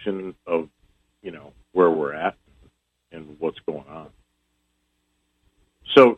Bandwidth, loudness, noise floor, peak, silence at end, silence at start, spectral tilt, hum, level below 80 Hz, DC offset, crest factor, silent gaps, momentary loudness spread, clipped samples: 7.2 kHz; -23 LUFS; -72 dBFS; -2 dBFS; 0.05 s; 0 s; -6.5 dB/octave; none; -62 dBFS; under 0.1%; 24 dB; none; 24 LU; under 0.1%